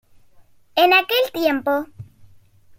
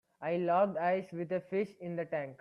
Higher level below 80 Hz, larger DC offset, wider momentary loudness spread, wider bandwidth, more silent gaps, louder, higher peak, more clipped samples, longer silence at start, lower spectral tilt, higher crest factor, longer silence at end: first, -60 dBFS vs -80 dBFS; neither; about the same, 11 LU vs 9 LU; first, 16.5 kHz vs 10.5 kHz; neither; first, -18 LUFS vs -34 LUFS; first, -2 dBFS vs -18 dBFS; neither; first, 0.75 s vs 0.2 s; second, -4 dB/octave vs -8.5 dB/octave; about the same, 20 dB vs 16 dB; first, 0.75 s vs 0.05 s